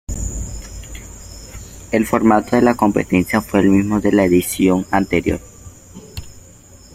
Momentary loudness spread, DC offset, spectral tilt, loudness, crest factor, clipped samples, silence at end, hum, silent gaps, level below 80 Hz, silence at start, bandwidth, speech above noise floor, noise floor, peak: 21 LU; under 0.1%; -6 dB/octave; -16 LUFS; 16 dB; under 0.1%; 0.55 s; none; none; -36 dBFS; 0.1 s; 16 kHz; 28 dB; -43 dBFS; -2 dBFS